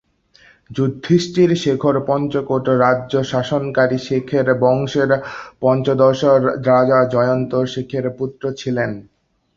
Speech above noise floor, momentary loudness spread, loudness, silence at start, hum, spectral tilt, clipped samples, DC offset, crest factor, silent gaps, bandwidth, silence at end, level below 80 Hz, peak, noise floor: 35 dB; 9 LU; -17 LUFS; 0.7 s; none; -7 dB/octave; under 0.1%; under 0.1%; 16 dB; none; 7.8 kHz; 0.55 s; -54 dBFS; -2 dBFS; -51 dBFS